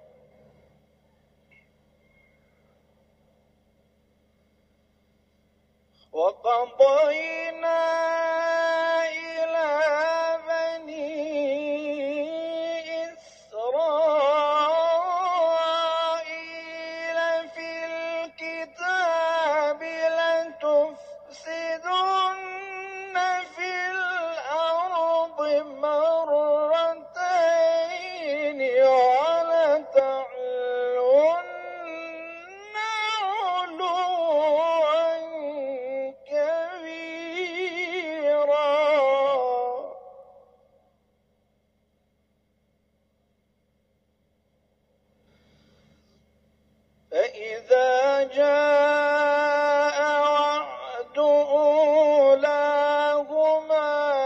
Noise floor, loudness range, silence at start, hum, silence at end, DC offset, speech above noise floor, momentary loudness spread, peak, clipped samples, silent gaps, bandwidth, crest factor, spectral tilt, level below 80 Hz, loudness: -70 dBFS; 7 LU; 6.15 s; 50 Hz at -75 dBFS; 0 s; under 0.1%; 47 dB; 14 LU; -6 dBFS; under 0.1%; none; 8.2 kHz; 18 dB; -2.5 dB/octave; -74 dBFS; -24 LUFS